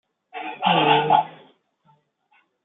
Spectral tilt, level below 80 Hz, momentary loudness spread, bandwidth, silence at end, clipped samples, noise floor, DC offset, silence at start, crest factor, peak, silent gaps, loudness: -9 dB/octave; -72 dBFS; 18 LU; 4.1 kHz; 1.35 s; under 0.1%; -64 dBFS; under 0.1%; 0.35 s; 20 dB; -4 dBFS; none; -19 LUFS